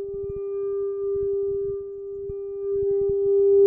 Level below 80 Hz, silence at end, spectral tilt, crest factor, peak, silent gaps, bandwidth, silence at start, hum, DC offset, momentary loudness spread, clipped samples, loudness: -50 dBFS; 0 s; -13.5 dB/octave; 14 dB; -10 dBFS; none; 1.7 kHz; 0 s; none; under 0.1%; 12 LU; under 0.1%; -26 LUFS